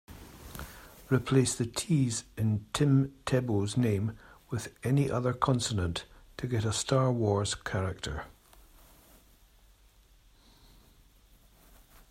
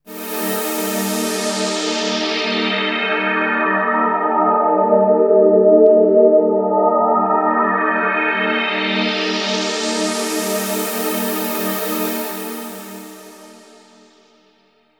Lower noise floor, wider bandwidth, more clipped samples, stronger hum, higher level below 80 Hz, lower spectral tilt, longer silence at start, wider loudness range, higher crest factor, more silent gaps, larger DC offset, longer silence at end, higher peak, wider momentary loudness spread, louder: first, -61 dBFS vs -57 dBFS; second, 16 kHz vs over 20 kHz; neither; second, none vs 50 Hz at -55 dBFS; first, -54 dBFS vs -80 dBFS; first, -5.5 dB/octave vs -3.5 dB/octave; about the same, 0.1 s vs 0.05 s; about the same, 8 LU vs 9 LU; about the same, 20 dB vs 16 dB; neither; neither; first, 3.85 s vs 1.4 s; second, -10 dBFS vs -2 dBFS; first, 18 LU vs 9 LU; second, -30 LUFS vs -16 LUFS